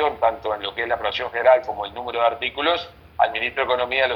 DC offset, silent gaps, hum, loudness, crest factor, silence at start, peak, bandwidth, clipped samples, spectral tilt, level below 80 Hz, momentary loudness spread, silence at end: under 0.1%; none; none; -22 LUFS; 18 dB; 0 s; -4 dBFS; 6.2 kHz; under 0.1%; -5 dB/octave; -52 dBFS; 9 LU; 0 s